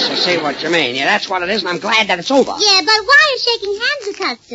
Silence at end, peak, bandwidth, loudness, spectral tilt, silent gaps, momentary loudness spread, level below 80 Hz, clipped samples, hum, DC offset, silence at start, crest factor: 0 s; 0 dBFS; 8 kHz; -13 LUFS; -2 dB/octave; none; 8 LU; -56 dBFS; under 0.1%; none; under 0.1%; 0 s; 14 dB